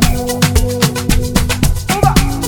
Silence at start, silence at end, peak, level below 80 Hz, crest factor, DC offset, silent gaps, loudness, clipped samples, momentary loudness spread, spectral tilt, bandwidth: 0 s; 0 s; 0 dBFS; -18 dBFS; 12 dB; under 0.1%; none; -14 LUFS; under 0.1%; 3 LU; -4.5 dB/octave; 19.5 kHz